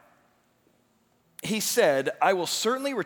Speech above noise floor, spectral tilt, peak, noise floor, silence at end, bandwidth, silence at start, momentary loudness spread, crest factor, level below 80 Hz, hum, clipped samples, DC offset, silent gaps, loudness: 42 dB; -2.5 dB/octave; -8 dBFS; -67 dBFS; 0 s; over 20 kHz; 1.4 s; 7 LU; 20 dB; -78 dBFS; 60 Hz at -65 dBFS; under 0.1%; under 0.1%; none; -25 LUFS